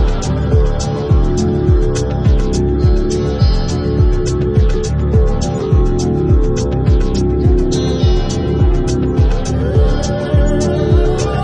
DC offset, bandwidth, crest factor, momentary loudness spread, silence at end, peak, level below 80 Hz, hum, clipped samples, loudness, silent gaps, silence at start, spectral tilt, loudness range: under 0.1%; 9.6 kHz; 12 dB; 3 LU; 0 s; -2 dBFS; -16 dBFS; none; under 0.1%; -15 LUFS; none; 0 s; -7 dB/octave; 0 LU